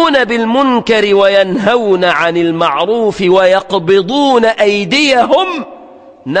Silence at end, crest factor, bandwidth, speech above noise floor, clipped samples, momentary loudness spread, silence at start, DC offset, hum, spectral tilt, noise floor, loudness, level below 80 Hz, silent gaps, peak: 0 s; 10 dB; 9.6 kHz; 26 dB; under 0.1%; 4 LU; 0 s; under 0.1%; none; -5 dB/octave; -36 dBFS; -10 LUFS; -50 dBFS; none; 0 dBFS